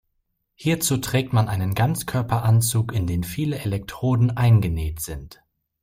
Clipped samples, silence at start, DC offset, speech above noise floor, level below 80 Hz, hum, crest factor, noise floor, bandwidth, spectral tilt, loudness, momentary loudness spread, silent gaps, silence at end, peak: under 0.1%; 0.6 s; under 0.1%; 52 dB; -42 dBFS; none; 16 dB; -73 dBFS; 16 kHz; -5.5 dB/octave; -22 LUFS; 10 LU; none; 0.5 s; -6 dBFS